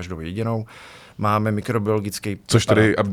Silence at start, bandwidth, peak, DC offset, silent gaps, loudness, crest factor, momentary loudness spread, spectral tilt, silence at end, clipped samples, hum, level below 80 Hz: 0 s; 15 kHz; -2 dBFS; under 0.1%; none; -21 LUFS; 20 dB; 15 LU; -5.5 dB/octave; 0 s; under 0.1%; none; -48 dBFS